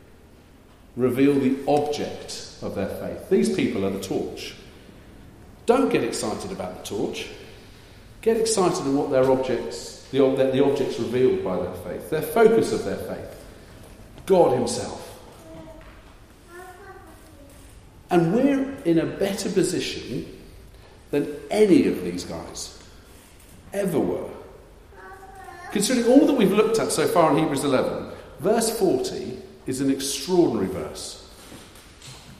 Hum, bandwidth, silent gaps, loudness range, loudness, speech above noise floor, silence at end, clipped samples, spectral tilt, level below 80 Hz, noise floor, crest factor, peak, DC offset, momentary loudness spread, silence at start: none; 15.5 kHz; none; 6 LU; -23 LUFS; 28 dB; 0 s; under 0.1%; -5 dB/octave; -52 dBFS; -50 dBFS; 20 dB; -4 dBFS; under 0.1%; 23 LU; 0.95 s